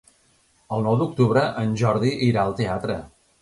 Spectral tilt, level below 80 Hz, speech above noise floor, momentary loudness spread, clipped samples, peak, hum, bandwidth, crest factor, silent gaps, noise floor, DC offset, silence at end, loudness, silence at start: -7.5 dB/octave; -50 dBFS; 40 dB; 9 LU; under 0.1%; -6 dBFS; none; 11.5 kHz; 18 dB; none; -61 dBFS; under 0.1%; 0.35 s; -22 LUFS; 0.7 s